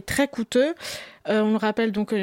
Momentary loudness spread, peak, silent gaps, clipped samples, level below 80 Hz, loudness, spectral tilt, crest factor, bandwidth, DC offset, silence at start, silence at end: 11 LU; -10 dBFS; none; under 0.1%; -54 dBFS; -24 LUFS; -4.5 dB/octave; 14 dB; 16.5 kHz; under 0.1%; 0.05 s; 0 s